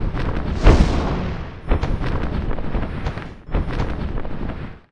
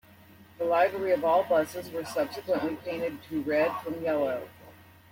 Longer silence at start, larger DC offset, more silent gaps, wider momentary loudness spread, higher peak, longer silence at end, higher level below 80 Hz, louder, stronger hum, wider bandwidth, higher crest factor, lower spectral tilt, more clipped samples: second, 0 s vs 0.4 s; neither; neither; first, 13 LU vs 9 LU; first, 0 dBFS vs -12 dBFS; second, 0.1 s vs 0.35 s; first, -22 dBFS vs -68 dBFS; first, -23 LUFS vs -29 LUFS; neither; second, 9 kHz vs 16.5 kHz; about the same, 20 dB vs 18 dB; first, -7.5 dB/octave vs -5.5 dB/octave; neither